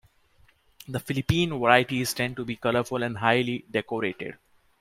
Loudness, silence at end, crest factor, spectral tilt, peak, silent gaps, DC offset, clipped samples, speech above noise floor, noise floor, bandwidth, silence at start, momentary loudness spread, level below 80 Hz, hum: -26 LUFS; 0.45 s; 24 dB; -5 dB/octave; -2 dBFS; none; under 0.1%; under 0.1%; 35 dB; -61 dBFS; 16.5 kHz; 0.9 s; 12 LU; -54 dBFS; none